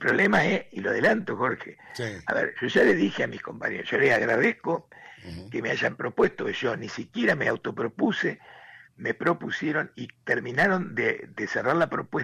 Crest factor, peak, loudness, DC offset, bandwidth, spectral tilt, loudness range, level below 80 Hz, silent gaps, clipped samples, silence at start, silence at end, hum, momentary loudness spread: 14 dB; -12 dBFS; -26 LUFS; under 0.1%; 13 kHz; -6 dB/octave; 3 LU; -62 dBFS; none; under 0.1%; 0 s; 0 s; none; 13 LU